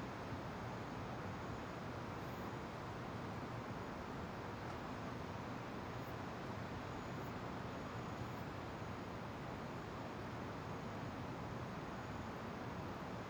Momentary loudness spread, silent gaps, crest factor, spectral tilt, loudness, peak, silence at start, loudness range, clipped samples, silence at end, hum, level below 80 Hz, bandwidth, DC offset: 1 LU; none; 14 dB; -6.5 dB/octave; -47 LUFS; -34 dBFS; 0 s; 0 LU; under 0.1%; 0 s; none; -62 dBFS; over 20 kHz; under 0.1%